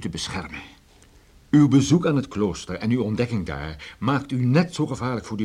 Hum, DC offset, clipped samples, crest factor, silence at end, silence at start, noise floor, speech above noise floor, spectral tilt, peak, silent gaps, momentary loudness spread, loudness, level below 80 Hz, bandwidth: none; under 0.1%; under 0.1%; 16 dB; 0 s; 0 s; -53 dBFS; 31 dB; -6.5 dB/octave; -6 dBFS; none; 15 LU; -23 LUFS; -48 dBFS; 11.5 kHz